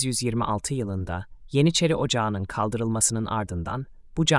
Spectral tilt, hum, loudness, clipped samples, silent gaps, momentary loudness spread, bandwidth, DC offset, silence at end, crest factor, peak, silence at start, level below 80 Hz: -4.5 dB/octave; none; -25 LUFS; under 0.1%; none; 11 LU; 12 kHz; under 0.1%; 0 s; 20 dB; -6 dBFS; 0 s; -46 dBFS